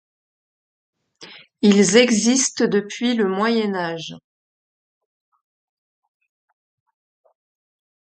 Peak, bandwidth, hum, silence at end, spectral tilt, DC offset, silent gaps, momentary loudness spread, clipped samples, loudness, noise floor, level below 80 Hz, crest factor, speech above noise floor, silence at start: 0 dBFS; 9.2 kHz; none; 3.9 s; -3.5 dB/octave; under 0.1%; none; 12 LU; under 0.1%; -18 LUFS; -44 dBFS; -68 dBFS; 22 dB; 27 dB; 1.2 s